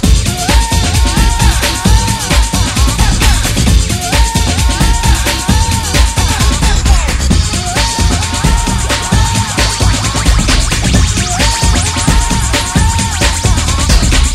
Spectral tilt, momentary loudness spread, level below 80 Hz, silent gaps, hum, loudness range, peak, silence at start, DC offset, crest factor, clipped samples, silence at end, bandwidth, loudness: -3.5 dB/octave; 2 LU; -12 dBFS; none; none; 1 LU; 0 dBFS; 0 s; under 0.1%; 10 dB; 0.2%; 0 s; 15.5 kHz; -11 LUFS